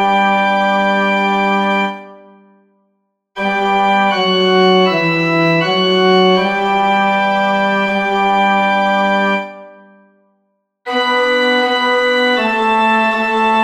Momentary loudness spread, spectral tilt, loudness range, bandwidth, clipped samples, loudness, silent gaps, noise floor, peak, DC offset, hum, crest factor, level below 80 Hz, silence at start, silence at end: 6 LU; -5.5 dB/octave; 4 LU; 13.5 kHz; under 0.1%; -13 LUFS; none; -66 dBFS; -2 dBFS; under 0.1%; none; 12 dB; -54 dBFS; 0 s; 0 s